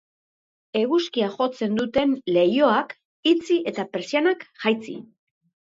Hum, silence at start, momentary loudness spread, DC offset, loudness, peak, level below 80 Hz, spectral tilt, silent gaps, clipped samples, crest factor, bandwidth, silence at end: none; 0.75 s; 9 LU; under 0.1%; -23 LUFS; -6 dBFS; -62 dBFS; -5.5 dB/octave; 3.05-3.23 s; under 0.1%; 18 dB; 7.8 kHz; 0.65 s